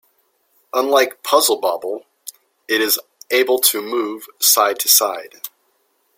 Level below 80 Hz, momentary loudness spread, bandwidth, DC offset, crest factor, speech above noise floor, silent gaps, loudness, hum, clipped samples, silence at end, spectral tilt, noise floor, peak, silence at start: -70 dBFS; 20 LU; 16.5 kHz; under 0.1%; 20 dB; 47 dB; none; -16 LUFS; none; under 0.1%; 0.7 s; 0.5 dB/octave; -64 dBFS; 0 dBFS; 0.75 s